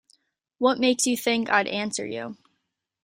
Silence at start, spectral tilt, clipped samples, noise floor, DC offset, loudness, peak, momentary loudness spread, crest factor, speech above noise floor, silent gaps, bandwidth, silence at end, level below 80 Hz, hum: 0.6 s; -2.5 dB/octave; under 0.1%; -78 dBFS; under 0.1%; -24 LUFS; -6 dBFS; 12 LU; 20 dB; 54 dB; none; 16 kHz; 0.7 s; -70 dBFS; none